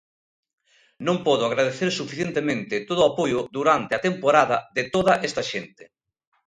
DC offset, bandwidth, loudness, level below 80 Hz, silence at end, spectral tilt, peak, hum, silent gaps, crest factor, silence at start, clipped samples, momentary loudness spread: under 0.1%; 11 kHz; -23 LUFS; -60 dBFS; 0.65 s; -4.5 dB/octave; -2 dBFS; none; none; 22 dB; 1 s; under 0.1%; 8 LU